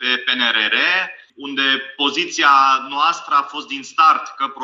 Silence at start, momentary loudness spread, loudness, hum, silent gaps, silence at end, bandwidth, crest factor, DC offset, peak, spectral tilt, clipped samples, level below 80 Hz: 0 s; 12 LU; -16 LUFS; none; none; 0 s; 7.8 kHz; 16 dB; under 0.1%; -2 dBFS; -0.5 dB/octave; under 0.1%; -78 dBFS